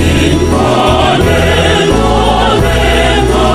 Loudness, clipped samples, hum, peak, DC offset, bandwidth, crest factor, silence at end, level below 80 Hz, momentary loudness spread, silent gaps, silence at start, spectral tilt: -9 LUFS; 0.5%; none; 0 dBFS; 1%; 15 kHz; 8 dB; 0 s; -16 dBFS; 1 LU; none; 0 s; -5 dB/octave